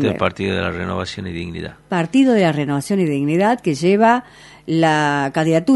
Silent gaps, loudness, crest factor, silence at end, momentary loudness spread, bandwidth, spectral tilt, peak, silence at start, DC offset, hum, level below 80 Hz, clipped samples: none; -18 LUFS; 18 dB; 0 s; 12 LU; 11.5 kHz; -6 dB/octave; 0 dBFS; 0 s; under 0.1%; none; -50 dBFS; under 0.1%